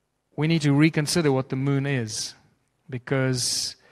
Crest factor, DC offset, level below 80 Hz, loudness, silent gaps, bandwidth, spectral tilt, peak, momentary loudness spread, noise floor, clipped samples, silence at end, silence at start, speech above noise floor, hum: 18 dB; under 0.1%; -60 dBFS; -24 LUFS; none; 14.5 kHz; -5 dB/octave; -6 dBFS; 13 LU; -64 dBFS; under 0.1%; 0.2 s; 0.4 s; 40 dB; none